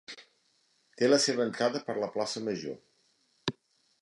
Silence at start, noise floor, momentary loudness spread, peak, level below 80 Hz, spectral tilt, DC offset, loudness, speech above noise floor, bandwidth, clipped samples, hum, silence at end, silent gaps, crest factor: 0.1 s; -71 dBFS; 19 LU; -10 dBFS; -76 dBFS; -3.5 dB/octave; under 0.1%; -30 LUFS; 42 dB; 11.5 kHz; under 0.1%; none; 0.5 s; none; 22 dB